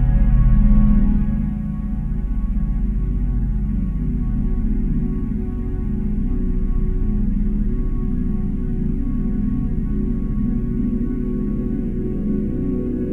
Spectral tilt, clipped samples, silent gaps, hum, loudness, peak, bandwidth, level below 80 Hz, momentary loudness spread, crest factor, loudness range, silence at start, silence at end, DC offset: -11.5 dB/octave; under 0.1%; none; none; -22 LUFS; -4 dBFS; 2.6 kHz; -20 dBFS; 7 LU; 14 dB; 3 LU; 0 s; 0 s; under 0.1%